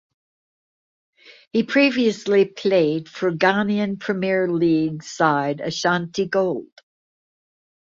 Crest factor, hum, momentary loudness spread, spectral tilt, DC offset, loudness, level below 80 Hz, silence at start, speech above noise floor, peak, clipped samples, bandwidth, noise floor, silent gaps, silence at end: 20 dB; none; 7 LU; -5.5 dB/octave; under 0.1%; -20 LUFS; -64 dBFS; 1.3 s; over 70 dB; -2 dBFS; under 0.1%; 7.8 kHz; under -90 dBFS; 1.47-1.51 s; 1.2 s